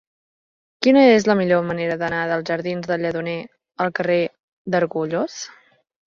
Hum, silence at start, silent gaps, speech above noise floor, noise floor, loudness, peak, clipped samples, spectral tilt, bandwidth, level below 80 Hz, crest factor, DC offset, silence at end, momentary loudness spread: none; 0.8 s; 4.43-4.65 s; over 71 dB; under -90 dBFS; -20 LUFS; -2 dBFS; under 0.1%; -5.5 dB/octave; 7.4 kHz; -60 dBFS; 18 dB; under 0.1%; 0.65 s; 15 LU